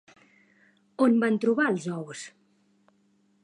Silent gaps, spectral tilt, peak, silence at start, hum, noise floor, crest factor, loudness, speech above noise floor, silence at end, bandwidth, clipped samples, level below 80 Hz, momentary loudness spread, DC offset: none; -6 dB/octave; -10 dBFS; 1 s; none; -66 dBFS; 18 dB; -25 LUFS; 42 dB; 1.15 s; 10.5 kHz; under 0.1%; -82 dBFS; 20 LU; under 0.1%